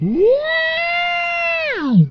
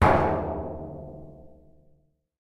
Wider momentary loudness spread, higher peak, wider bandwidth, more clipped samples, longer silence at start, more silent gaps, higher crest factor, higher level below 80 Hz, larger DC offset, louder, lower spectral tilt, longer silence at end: second, 3 LU vs 23 LU; about the same, -4 dBFS vs -6 dBFS; second, 6.6 kHz vs 12 kHz; neither; about the same, 0 s vs 0 s; neither; second, 14 dB vs 22 dB; second, -48 dBFS vs -40 dBFS; neither; first, -16 LUFS vs -27 LUFS; about the same, -7.5 dB/octave vs -8 dB/octave; second, 0 s vs 0.95 s